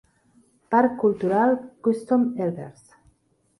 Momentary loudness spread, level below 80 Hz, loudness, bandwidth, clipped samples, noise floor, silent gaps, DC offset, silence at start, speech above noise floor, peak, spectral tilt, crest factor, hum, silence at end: 8 LU; -66 dBFS; -23 LUFS; 11.5 kHz; under 0.1%; -66 dBFS; none; under 0.1%; 0.7 s; 44 dB; -8 dBFS; -8.5 dB/octave; 16 dB; none; 0.9 s